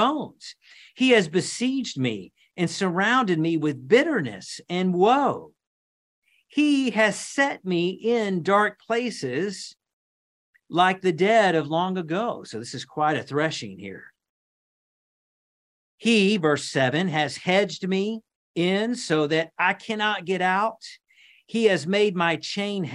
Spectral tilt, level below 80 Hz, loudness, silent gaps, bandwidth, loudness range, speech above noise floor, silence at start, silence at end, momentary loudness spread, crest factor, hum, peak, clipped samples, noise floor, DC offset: -5 dB/octave; -72 dBFS; -23 LUFS; 5.67-6.22 s, 9.93-10.53 s, 14.29-15.98 s, 18.35-18.54 s; 11.5 kHz; 4 LU; over 67 dB; 0 s; 0 s; 14 LU; 18 dB; none; -6 dBFS; under 0.1%; under -90 dBFS; under 0.1%